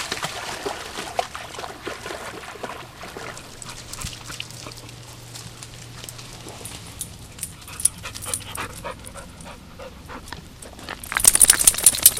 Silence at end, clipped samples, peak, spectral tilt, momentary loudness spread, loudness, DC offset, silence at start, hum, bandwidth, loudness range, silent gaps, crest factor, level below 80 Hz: 0 s; under 0.1%; 0 dBFS; -0.5 dB/octave; 25 LU; -20 LUFS; under 0.1%; 0 s; none; 17 kHz; 16 LU; none; 26 dB; -46 dBFS